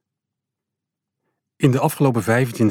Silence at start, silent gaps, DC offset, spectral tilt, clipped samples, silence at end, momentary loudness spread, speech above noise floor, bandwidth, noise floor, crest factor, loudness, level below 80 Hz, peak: 1.6 s; none; under 0.1%; -7 dB/octave; under 0.1%; 0 s; 2 LU; 66 dB; 18 kHz; -83 dBFS; 18 dB; -19 LUFS; -64 dBFS; -4 dBFS